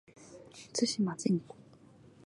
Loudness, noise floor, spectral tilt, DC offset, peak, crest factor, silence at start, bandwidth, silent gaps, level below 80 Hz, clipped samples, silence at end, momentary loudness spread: -33 LUFS; -58 dBFS; -5 dB/octave; under 0.1%; -16 dBFS; 20 dB; 0.2 s; 11.5 kHz; none; -74 dBFS; under 0.1%; 0.8 s; 23 LU